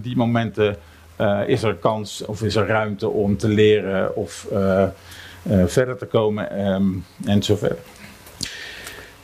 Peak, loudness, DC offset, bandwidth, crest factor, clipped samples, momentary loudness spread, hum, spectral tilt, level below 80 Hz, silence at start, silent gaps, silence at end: -4 dBFS; -21 LUFS; under 0.1%; 15.5 kHz; 16 dB; under 0.1%; 15 LU; none; -6 dB/octave; -50 dBFS; 0 s; none; 0.1 s